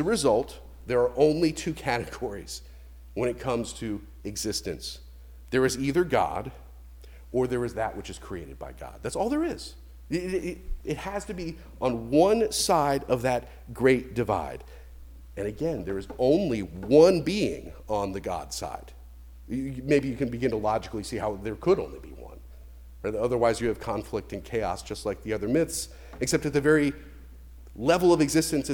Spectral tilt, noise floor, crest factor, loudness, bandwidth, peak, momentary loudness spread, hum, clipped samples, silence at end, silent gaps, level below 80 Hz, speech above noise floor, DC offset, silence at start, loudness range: -5 dB/octave; -46 dBFS; 20 dB; -27 LUFS; 19.5 kHz; -6 dBFS; 16 LU; none; under 0.1%; 0 s; none; -46 dBFS; 19 dB; under 0.1%; 0 s; 7 LU